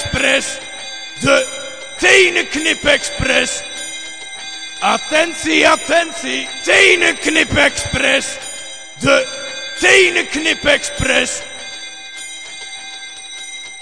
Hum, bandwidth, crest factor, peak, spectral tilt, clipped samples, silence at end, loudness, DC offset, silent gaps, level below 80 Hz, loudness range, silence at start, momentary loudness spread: none; 11 kHz; 16 dB; 0 dBFS; -2 dB/octave; under 0.1%; 0 s; -13 LUFS; 0.9%; none; -40 dBFS; 4 LU; 0 s; 18 LU